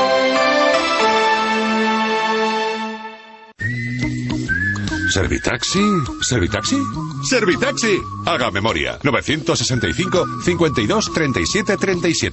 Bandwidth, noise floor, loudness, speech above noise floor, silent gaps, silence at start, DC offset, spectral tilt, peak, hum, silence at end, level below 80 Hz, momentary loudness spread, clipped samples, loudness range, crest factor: 8.4 kHz; -40 dBFS; -18 LUFS; 22 dB; none; 0 s; under 0.1%; -4 dB/octave; -2 dBFS; none; 0 s; -38 dBFS; 7 LU; under 0.1%; 3 LU; 16 dB